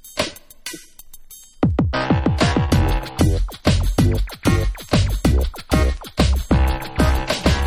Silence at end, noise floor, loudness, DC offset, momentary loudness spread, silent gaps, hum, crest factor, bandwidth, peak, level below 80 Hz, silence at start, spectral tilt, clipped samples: 0 s; -40 dBFS; -20 LUFS; under 0.1%; 7 LU; none; none; 18 dB; 16 kHz; -2 dBFS; -22 dBFS; 0.05 s; -6 dB/octave; under 0.1%